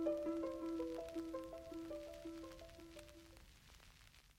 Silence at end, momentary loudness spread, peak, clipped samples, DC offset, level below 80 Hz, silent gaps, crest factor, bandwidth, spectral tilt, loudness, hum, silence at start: 0.05 s; 20 LU; -28 dBFS; under 0.1%; under 0.1%; -66 dBFS; none; 18 dB; 16.5 kHz; -5.5 dB/octave; -48 LUFS; none; 0 s